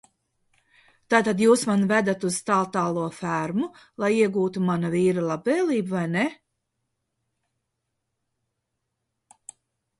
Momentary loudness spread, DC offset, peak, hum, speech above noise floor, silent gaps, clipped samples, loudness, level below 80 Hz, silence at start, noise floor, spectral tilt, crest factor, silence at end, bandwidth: 8 LU; under 0.1%; -6 dBFS; none; 57 dB; none; under 0.1%; -24 LUFS; -68 dBFS; 1.1 s; -80 dBFS; -5.5 dB/octave; 20 dB; 3.65 s; 11.5 kHz